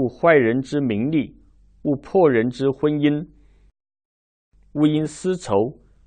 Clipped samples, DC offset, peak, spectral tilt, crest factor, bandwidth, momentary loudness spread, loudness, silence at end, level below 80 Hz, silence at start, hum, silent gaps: under 0.1%; under 0.1%; -4 dBFS; -7 dB/octave; 18 dB; 9.4 kHz; 11 LU; -20 LUFS; 0.35 s; -54 dBFS; 0 s; none; 4.05-4.52 s